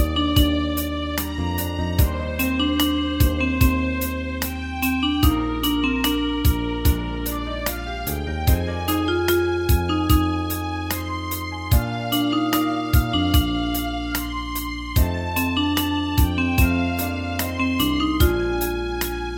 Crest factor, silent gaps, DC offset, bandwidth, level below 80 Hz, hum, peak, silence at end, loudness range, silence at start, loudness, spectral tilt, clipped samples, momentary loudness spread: 18 dB; none; under 0.1%; 17.5 kHz; -28 dBFS; none; -4 dBFS; 0 s; 1 LU; 0 s; -22 LUFS; -5 dB/octave; under 0.1%; 7 LU